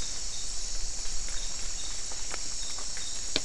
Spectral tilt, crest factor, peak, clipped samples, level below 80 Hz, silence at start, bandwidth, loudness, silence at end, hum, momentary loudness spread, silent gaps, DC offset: -0.5 dB/octave; 26 dB; -8 dBFS; under 0.1%; -40 dBFS; 0 s; 12 kHz; -34 LUFS; 0 s; none; 1 LU; none; 3%